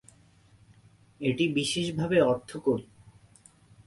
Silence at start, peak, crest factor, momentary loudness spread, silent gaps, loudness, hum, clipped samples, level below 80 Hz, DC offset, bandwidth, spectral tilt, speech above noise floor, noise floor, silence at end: 1.2 s; -10 dBFS; 20 dB; 7 LU; none; -28 LUFS; none; under 0.1%; -62 dBFS; under 0.1%; 11.5 kHz; -5 dB/octave; 32 dB; -59 dBFS; 1.05 s